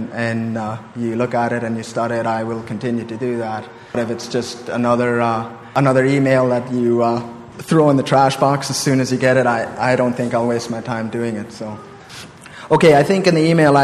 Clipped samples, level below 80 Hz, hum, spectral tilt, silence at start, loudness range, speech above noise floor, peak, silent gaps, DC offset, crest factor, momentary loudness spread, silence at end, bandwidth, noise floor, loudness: under 0.1%; -54 dBFS; none; -6 dB/octave; 0 s; 6 LU; 20 dB; 0 dBFS; none; under 0.1%; 16 dB; 13 LU; 0 s; 13.5 kHz; -37 dBFS; -17 LUFS